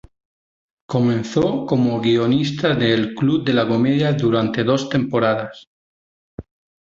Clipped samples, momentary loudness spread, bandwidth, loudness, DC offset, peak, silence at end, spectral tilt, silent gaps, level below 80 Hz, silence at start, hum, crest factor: under 0.1%; 3 LU; 7.6 kHz; -18 LUFS; under 0.1%; -4 dBFS; 0.45 s; -7 dB/octave; 5.67-6.38 s; -52 dBFS; 0.9 s; none; 16 dB